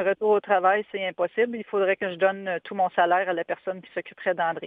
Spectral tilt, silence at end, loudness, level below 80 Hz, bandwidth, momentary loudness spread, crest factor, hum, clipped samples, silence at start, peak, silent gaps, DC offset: -7.5 dB/octave; 0 s; -25 LUFS; -76 dBFS; 3.9 kHz; 9 LU; 18 dB; none; under 0.1%; 0 s; -8 dBFS; none; under 0.1%